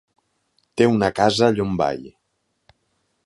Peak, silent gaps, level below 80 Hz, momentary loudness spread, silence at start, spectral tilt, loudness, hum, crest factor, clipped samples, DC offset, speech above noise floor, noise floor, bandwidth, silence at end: -2 dBFS; none; -52 dBFS; 12 LU; 0.75 s; -5.5 dB/octave; -19 LUFS; none; 20 dB; under 0.1%; under 0.1%; 54 dB; -72 dBFS; 11.5 kHz; 1.15 s